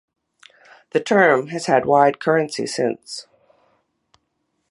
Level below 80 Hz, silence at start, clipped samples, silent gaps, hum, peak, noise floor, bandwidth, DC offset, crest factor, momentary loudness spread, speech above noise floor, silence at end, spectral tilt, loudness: -66 dBFS; 0.95 s; under 0.1%; none; none; -2 dBFS; -72 dBFS; 11.5 kHz; under 0.1%; 20 dB; 13 LU; 54 dB; 1.5 s; -4.5 dB/octave; -18 LUFS